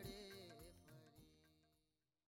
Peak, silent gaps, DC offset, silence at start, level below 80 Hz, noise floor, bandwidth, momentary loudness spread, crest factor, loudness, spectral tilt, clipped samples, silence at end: -42 dBFS; none; under 0.1%; 0 s; -74 dBFS; -89 dBFS; 16.5 kHz; 10 LU; 20 dB; -60 LUFS; -4.5 dB/octave; under 0.1%; 0.55 s